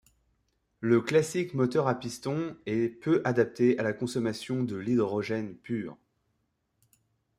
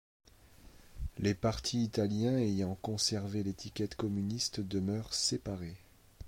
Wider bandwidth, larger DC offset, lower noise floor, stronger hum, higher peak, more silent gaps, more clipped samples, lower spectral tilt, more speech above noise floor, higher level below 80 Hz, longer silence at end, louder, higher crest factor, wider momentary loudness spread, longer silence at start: second, 14.5 kHz vs 16.5 kHz; neither; first, -77 dBFS vs -58 dBFS; neither; first, -12 dBFS vs -18 dBFS; neither; neither; first, -6.5 dB/octave vs -5 dB/octave; first, 49 dB vs 24 dB; second, -68 dBFS vs -54 dBFS; first, 1.45 s vs 0 s; first, -29 LUFS vs -34 LUFS; about the same, 18 dB vs 18 dB; about the same, 10 LU vs 10 LU; first, 0.8 s vs 0.65 s